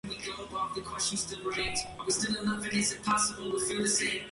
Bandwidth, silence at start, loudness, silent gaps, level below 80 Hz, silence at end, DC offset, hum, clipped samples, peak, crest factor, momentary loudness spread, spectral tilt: 11.5 kHz; 0.05 s; -31 LUFS; none; -56 dBFS; 0 s; under 0.1%; none; under 0.1%; -14 dBFS; 18 dB; 8 LU; -2 dB/octave